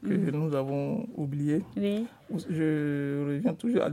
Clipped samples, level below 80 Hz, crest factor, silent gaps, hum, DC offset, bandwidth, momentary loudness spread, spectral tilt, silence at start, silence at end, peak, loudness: under 0.1%; -68 dBFS; 16 dB; none; none; under 0.1%; 14.5 kHz; 6 LU; -8.5 dB/octave; 0 s; 0 s; -14 dBFS; -30 LUFS